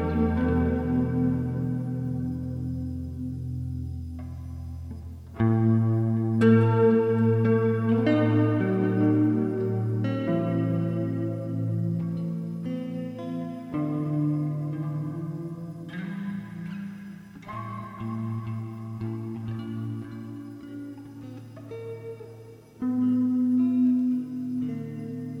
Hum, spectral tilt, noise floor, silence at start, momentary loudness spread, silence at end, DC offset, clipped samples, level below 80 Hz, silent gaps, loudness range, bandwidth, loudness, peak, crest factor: none; -10 dB/octave; -46 dBFS; 0 s; 17 LU; 0 s; under 0.1%; under 0.1%; -48 dBFS; none; 13 LU; 5.6 kHz; -27 LUFS; -8 dBFS; 18 dB